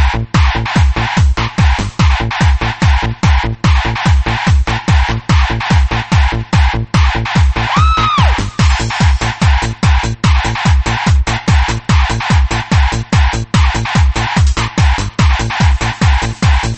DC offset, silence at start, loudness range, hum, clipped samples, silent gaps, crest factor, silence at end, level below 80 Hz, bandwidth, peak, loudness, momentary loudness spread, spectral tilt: under 0.1%; 0 s; 1 LU; none; under 0.1%; none; 10 dB; 0 s; -14 dBFS; 8.6 kHz; 0 dBFS; -13 LUFS; 1 LU; -5 dB/octave